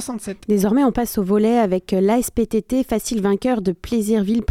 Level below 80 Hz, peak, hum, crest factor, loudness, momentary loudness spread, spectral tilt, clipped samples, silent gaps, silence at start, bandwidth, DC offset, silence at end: -42 dBFS; -4 dBFS; none; 14 dB; -19 LUFS; 5 LU; -6 dB/octave; under 0.1%; none; 0 s; 16.5 kHz; under 0.1%; 0.05 s